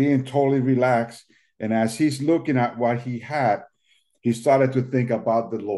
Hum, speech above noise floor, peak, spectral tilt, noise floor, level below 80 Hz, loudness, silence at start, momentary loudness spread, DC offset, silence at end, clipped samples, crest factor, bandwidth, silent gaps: none; 44 dB; -6 dBFS; -7 dB/octave; -65 dBFS; -68 dBFS; -22 LUFS; 0 s; 8 LU; under 0.1%; 0 s; under 0.1%; 16 dB; 12 kHz; none